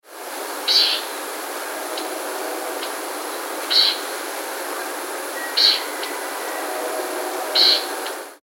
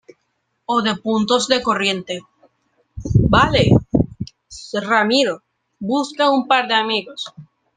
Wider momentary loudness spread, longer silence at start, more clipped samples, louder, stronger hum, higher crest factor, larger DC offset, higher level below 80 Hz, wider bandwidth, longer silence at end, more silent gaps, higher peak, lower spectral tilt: second, 13 LU vs 17 LU; second, 0.05 s vs 0.7 s; neither; second, -21 LUFS vs -17 LUFS; neither; about the same, 22 dB vs 18 dB; neither; second, -86 dBFS vs -38 dBFS; first, 16.5 kHz vs 9.8 kHz; second, 0.05 s vs 0.35 s; neither; about the same, 0 dBFS vs -2 dBFS; second, 2 dB/octave vs -5 dB/octave